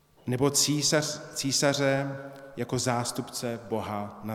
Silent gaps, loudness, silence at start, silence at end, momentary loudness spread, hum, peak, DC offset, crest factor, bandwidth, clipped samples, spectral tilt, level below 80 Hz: none; -27 LUFS; 0.25 s; 0 s; 12 LU; none; -10 dBFS; under 0.1%; 18 dB; 17.5 kHz; under 0.1%; -3.5 dB/octave; -64 dBFS